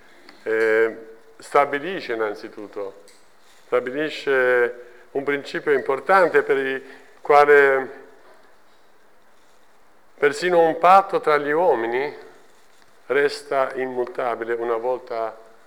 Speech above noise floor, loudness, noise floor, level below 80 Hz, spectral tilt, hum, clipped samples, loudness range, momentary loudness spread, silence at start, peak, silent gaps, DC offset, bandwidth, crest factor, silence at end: 37 dB; -20 LUFS; -57 dBFS; -70 dBFS; -4.5 dB/octave; none; under 0.1%; 6 LU; 16 LU; 0.45 s; -4 dBFS; none; 0.3%; 15.5 kHz; 18 dB; 0.3 s